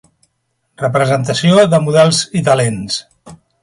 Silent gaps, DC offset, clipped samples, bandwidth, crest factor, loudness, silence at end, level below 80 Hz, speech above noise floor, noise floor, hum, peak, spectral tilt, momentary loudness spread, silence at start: none; under 0.1%; under 0.1%; 11.5 kHz; 14 dB; -13 LUFS; 0.25 s; -50 dBFS; 55 dB; -67 dBFS; none; 0 dBFS; -5 dB/octave; 11 LU; 0.8 s